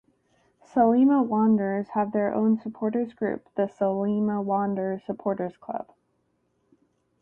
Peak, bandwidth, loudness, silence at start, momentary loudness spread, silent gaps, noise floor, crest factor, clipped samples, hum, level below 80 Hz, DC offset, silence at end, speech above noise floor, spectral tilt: -8 dBFS; 3.2 kHz; -25 LUFS; 0.75 s; 11 LU; none; -72 dBFS; 18 dB; under 0.1%; none; -68 dBFS; under 0.1%; 1.4 s; 47 dB; -10 dB/octave